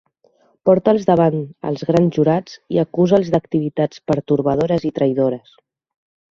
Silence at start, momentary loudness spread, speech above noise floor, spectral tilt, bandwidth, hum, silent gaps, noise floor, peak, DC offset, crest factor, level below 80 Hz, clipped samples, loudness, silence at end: 0.65 s; 8 LU; 41 dB; -8.5 dB/octave; 7.4 kHz; none; none; -58 dBFS; 0 dBFS; under 0.1%; 18 dB; -52 dBFS; under 0.1%; -18 LUFS; 0.95 s